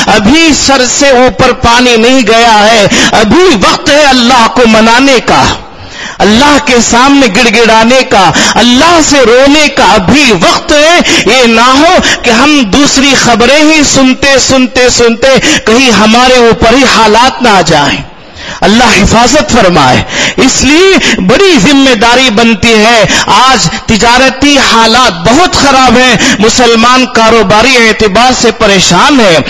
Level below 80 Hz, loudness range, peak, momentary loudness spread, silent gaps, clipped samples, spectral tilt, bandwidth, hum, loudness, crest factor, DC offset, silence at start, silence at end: -26 dBFS; 1 LU; 0 dBFS; 3 LU; none; 10%; -3 dB/octave; 12 kHz; none; -3 LUFS; 4 dB; 5%; 0 s; 0 s